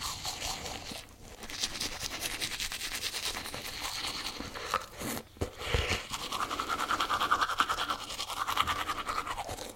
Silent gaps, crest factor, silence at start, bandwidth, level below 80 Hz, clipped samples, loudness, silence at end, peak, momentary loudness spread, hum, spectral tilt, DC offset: none; 26 dB; 0 s; 17 kHz; -48 dBFS; under 0.1%; -33 LUFS; 0 s; -8 dBFS; 9 LU; none; -2 dB/octave; under 0.1%